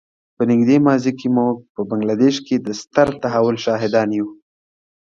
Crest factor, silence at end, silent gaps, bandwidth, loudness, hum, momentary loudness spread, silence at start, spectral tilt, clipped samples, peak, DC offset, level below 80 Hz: 18 dB; 0.7 s; 1.69-1.75 s; 7.6 kHz; -18 LUFS; none; 8 LU; 0.4 s; -6.5 dB/octave; under 0.1%; 0 dBFS; under 0.1%; -56 dBFS